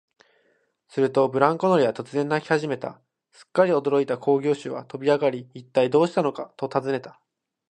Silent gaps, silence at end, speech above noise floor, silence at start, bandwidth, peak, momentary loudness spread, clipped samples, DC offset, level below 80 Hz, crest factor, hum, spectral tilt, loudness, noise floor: none; 0.6 s; 44 dB; 0.95 s; 9.4 kHz; -2 dBFS; 11 LU; under 0.1%; under 0.1%; -72 dBFS; 22 dB; none; -6.5 dB/octave; -23 LUFS; -67 dBFS